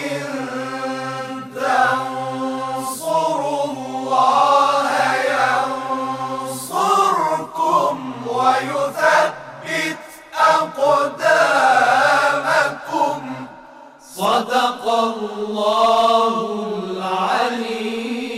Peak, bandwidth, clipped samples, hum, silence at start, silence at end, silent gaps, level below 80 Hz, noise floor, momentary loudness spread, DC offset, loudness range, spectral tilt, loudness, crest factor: -4 dBFS; 16 kHz; under 0.1%; none; 0 s; 0 s; none; -64 dBFS; -42 dBFS; 11 LU; under 0.1%; 5 LU; -3.5 dB/octave; -18 LUFS; 14 dB